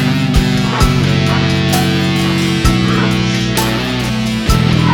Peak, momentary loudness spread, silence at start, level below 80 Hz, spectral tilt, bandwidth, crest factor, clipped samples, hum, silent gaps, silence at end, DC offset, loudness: 0 dBFS; 3 LU; 0 s; -22 dBFS; -5.5 dB/octave; 19 kHz; 12 dB; under 0.1%; none; none; 0 s; under 0.1%; -13 LUFS